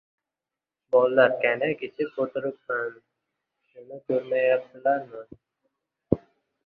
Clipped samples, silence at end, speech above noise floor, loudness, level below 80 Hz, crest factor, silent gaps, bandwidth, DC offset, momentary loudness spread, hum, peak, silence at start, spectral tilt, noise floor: under 0.1%; 0.5 s; 64 dB; -25 LUFS; -62 dBFS; 24 dB; none; 4.7 kHz; under 0.1%; 15 LU; none; -4 dBFS; 0.9 s; -9 dB/octave; -89 dBFS